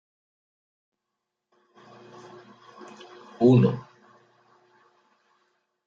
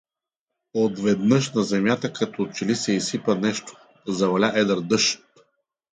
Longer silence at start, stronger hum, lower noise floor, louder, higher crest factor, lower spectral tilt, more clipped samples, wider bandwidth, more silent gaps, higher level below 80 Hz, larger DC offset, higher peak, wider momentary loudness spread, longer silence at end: first, 3.4 s vs 0.75 s; neither; about the same, -84 dBFS vs -86 dBFS; about the same, -21 LUFS vs -23 LUFS; about the same, 22 dB vs 18 dB; first, -9.5 dB/octave vs -4.5 dB/octave; neither; second, 7.2 kHz vs 9.6 kHz; neither; second, -72 dBFS vs -64 dBFS; neither; second, -8 dBFS vs -4 dBFS; first, 29 LU vs 9 LU; first, 2.05 s vs 0.75 s